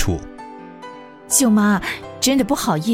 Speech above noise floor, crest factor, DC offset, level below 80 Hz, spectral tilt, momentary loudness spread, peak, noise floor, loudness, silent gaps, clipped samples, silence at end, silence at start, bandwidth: 20 dB; 18 dB; under 0.1%; -38 dBFS; -4 dB/octave; 22 LU; -2 dBFS; -38 dBFS; -18 LUFS; none; under 0.1%; 0 s; 0 s; 16.5 kHz